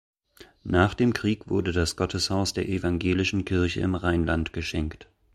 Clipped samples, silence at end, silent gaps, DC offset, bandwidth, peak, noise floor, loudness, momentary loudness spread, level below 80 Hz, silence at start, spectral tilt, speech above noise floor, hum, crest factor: under 0.1%; 0.3 s; none; under 0.1%; 13.5 kHz; -6 dBFS; -54 dBFS; -26 LUFS; 6 LU; -42 dBFS; 0.4 s; -5.5 dB/octave; 29 dB; none; 20 dB